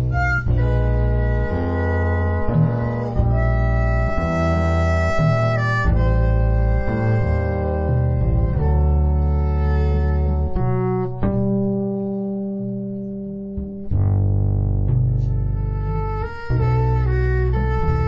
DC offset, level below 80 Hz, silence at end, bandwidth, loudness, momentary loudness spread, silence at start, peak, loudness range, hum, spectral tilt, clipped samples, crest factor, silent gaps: under 0.1%; -22 dBFS; 0 s; 7.6 kHz; -20 LUFS; 6 LU; 0 s; -6 dBFS; 4 LU; none; -9 dB/octave; under 0.1%; 12 dB; none